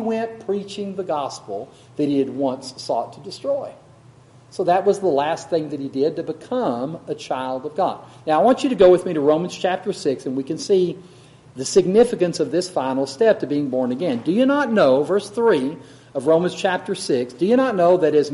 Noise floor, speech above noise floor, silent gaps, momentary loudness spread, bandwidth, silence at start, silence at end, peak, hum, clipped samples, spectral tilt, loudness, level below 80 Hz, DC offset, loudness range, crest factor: -48 dBFS; 28 dB; none; 12 LU; 11.5 kHz; 0 s; 0 s; 0 dBFS; none; under 0.1%; -5.5 dB/octave; -20 LUFS; -60 dBFS; under 0.1%; 6 LU; 20 dB